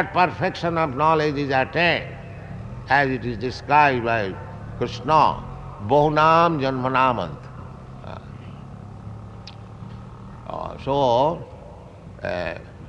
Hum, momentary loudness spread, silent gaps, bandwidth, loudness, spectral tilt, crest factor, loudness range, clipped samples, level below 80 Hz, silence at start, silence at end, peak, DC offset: none; 22 LU; none; 9.2 kHz; -21 LUFS; -6.5 dB/octave; 20 dB; 10 LU; under 0.1%; -46 dBFS; 0 s; 0 s; -4 dBFS; under 0.1%